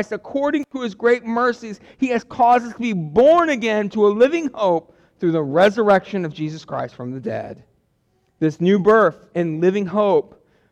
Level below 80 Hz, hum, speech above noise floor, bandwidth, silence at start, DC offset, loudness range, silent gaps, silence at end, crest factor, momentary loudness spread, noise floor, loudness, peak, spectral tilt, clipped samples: -58 dBFS; none; 46 dB; 9.6 kHz; 0 s; under 0.1%; 4 LU; none; 0.5 s; 14 dB; 13 LU; -65 dBFS; -19 LUFS; -6 dBFS; -6.5 dB/octave; under 0.1%